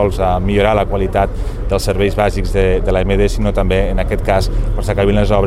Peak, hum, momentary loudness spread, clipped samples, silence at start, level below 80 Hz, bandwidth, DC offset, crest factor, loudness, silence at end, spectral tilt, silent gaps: 0 dBFS; none; 5 LU; under 0.1%; 0 s; -18 dBFS; 13.5 kHz; under 0.1%; 14 dB; -16 LUFS; 0 s; -6.5 dB/octave; none